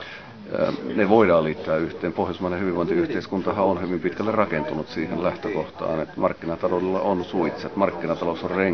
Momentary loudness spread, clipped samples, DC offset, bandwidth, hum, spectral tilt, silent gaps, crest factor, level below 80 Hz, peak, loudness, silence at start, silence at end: 8 LU; under 0.1%; 0.2%; 6.6 kHz; none; -8 dB/octave; none; 20 dB; -50 dBFS; -2 dBFS; -24 LUFS; 0 s; 0 s